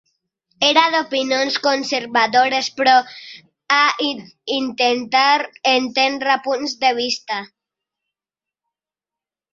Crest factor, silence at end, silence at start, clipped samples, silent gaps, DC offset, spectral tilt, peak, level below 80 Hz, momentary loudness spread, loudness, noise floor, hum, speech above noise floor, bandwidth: 18 dB; 2.1 s; 0.6 s; under 0.1%; none; under 0.1%; -1.5 dB/octave; 0 dBFS; -70 dBFS; 9 LU; -17 LUFS; -89 dBFS; none; 71 dB; 7.8 kHz